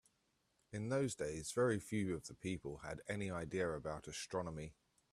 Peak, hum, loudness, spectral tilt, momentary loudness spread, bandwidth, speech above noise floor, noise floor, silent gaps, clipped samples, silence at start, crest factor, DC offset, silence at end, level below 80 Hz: -26 dBFS; none; -42 LUFS; -5.5 dB/octave; 11 LU; 14 kHz; 40 dB; -81 dBFS; none; under 0.1%; 0.7 s; 18 dB; under 0.1%; 0.4 s; -66 dBFS